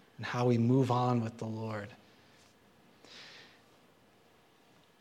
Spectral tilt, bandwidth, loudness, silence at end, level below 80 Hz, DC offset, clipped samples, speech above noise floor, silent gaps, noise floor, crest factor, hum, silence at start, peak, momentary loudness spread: -7.5 dB/octave; 9.4 kHz; -32 LUFS; 1.6 s; -76 dBFS; under 0.1%; under 0.1%; 34 dB; none; -65 dBFS; 18 dB; none; 0.2 s; -16 dBFS; 24 LU